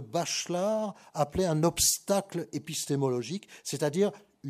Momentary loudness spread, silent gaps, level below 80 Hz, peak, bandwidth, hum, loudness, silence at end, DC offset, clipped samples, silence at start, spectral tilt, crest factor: 12 LU; none; -56 dBFS; -12 dBFS; 15.5 kHz; none; -29 LUFS; 0 s; under 0.1%; under 0.1%; 0 s; -4 dB/octave; 18 dB